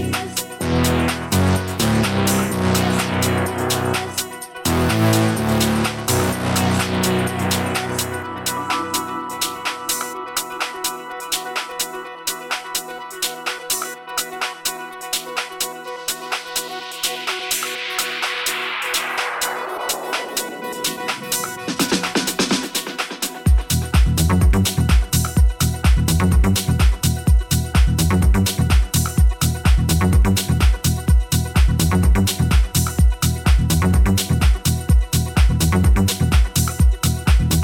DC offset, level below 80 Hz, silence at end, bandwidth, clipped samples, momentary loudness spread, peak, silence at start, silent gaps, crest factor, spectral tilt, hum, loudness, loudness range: under 0.1%; -22 dBFS; 0 s; 17.5 kHz; under 0.1%; 8 LU; -4 dBFS; 0 s; none; 14 dB; -4.5 dB/octave; none; -19 LUFS; 7 LU